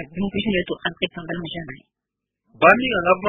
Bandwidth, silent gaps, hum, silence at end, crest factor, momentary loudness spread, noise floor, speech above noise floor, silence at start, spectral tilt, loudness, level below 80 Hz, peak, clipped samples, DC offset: 4.5 kHz; none; none; 0 s; 22 dB; 16 LU; -78 dBFS; 57 dB; 0 s; -7.5 dB/octave; -20 LUFS; -50 dBFS; 0 dBFS; under 0.1%; under 0.1%